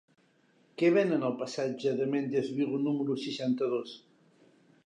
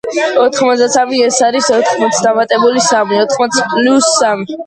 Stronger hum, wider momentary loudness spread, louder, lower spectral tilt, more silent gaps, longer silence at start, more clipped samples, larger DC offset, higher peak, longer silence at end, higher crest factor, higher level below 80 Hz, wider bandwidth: neither; first, 9 LU vs 3 LU; second, -30 LUFS vs -11 LUFS; first, -6.5 dB/octave vs -2.5 dB/octave; neither; first, 0.8 s vs 0.05 s; neither; neither; second, -14 dBFS vs 0 dBFS; first, 0.9 s vs 0 s; first, 18 dB vs 12 dB; second, -86 dBFS vs -58 dBFS; about the same, 10 kHz vs 11 kHz